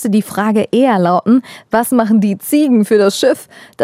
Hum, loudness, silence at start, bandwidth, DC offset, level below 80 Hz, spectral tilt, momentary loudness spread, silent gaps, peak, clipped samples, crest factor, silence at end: none; -13 LUFS; 0 s; 16 kHz; under 0.1%; -60 dBFS; -5.5 dB/octave; 4 LU; none; 0 dBFS; under 0.1%; 12 dB; 0 s